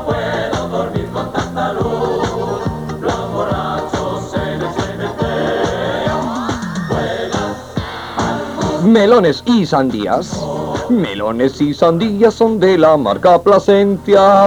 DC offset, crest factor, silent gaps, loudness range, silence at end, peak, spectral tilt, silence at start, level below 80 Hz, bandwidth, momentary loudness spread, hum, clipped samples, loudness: under 0.1%; 14 dB; none; 7 LU; 0 s; 0 dBFS; -6 dB/octave; 0 s; -38 dBFS; 19 kHz; 11 LU; none; under 0.1%; -15 LUFS